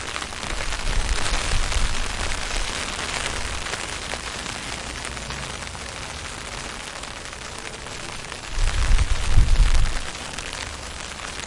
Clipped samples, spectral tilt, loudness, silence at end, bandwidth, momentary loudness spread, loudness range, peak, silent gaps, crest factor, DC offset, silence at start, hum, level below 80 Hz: under 0.1%; -3 dB/octave; -27 LUFS; 0 s; 11.5 kHz; 9 LU; 6 LU; -2 dBFS; none; 20 dB; under 0.1%; 0 s; none; -26 dBFS